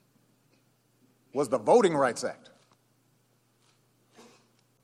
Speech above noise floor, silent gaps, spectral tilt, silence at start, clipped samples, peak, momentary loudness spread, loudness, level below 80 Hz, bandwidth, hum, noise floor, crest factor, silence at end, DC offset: 44 dB; none; -5 dB/octave; 1.35 s; under 0.1%; -8 dBFS; 15 LU; -26 LUFS; -78 dBFS; 13.5 kHz; none; -69 dBFS; 22 dB; 2.5 s; under 0.1%